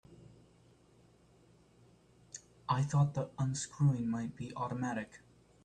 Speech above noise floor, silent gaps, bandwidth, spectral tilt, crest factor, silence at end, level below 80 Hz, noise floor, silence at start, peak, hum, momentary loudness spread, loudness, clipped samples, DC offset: 31 dB; none; 9.6 kHz; -6.5 dB/octave; 18 dB; 0.45 s; -66 dBFS; -65 dBFS; 0.1 s; -18 dBFS; none; 18 LU; -35 LUFS; under 0.1%; under 0.1%